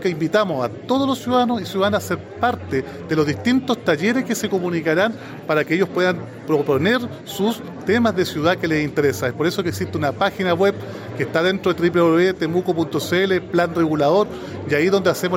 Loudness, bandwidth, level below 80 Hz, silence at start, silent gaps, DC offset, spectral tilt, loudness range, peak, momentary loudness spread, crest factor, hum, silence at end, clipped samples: -20 LUFS; 17 kHz; -58 dBFS; 0 s; none; under 0.1%; -5.5 dB/octave; 2 LU; -6 dBFS; 6 LU; 14 dB; none; 0 s; under 0.1%